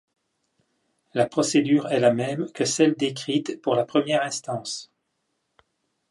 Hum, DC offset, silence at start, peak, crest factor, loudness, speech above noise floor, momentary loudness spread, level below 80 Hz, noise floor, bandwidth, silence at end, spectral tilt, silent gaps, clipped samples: none; under 0.1%; 1.15 s; -6 dBFS; 20 dB; -23 LUFS; 53 dB; 10 LU; -72 dBFS; -76 dBFS; 11.5 kHz; 1.25 s; -4.5 dB/octave; none; under 0.1%